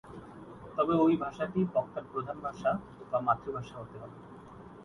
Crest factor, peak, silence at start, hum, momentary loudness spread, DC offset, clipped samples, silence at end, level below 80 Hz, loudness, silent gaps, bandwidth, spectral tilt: 20 dB; -14 dBFS; 0.05 s; none; 22 LU; under 0.1%; under 0.1%; 0 s; -62 dBFS; -32 LUFS; none; 10.5 kHz; -8.5 dB/octave